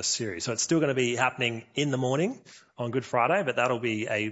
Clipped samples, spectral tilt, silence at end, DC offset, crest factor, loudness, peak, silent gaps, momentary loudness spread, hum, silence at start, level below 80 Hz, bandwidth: under 0.1%; -4 dB/octave; 0 s; under 0.1%; 18 dB; -27 LUFS; -8 dBFS; none; 7 LU; none; 0 s; -70 dBFS; 8.2 kHz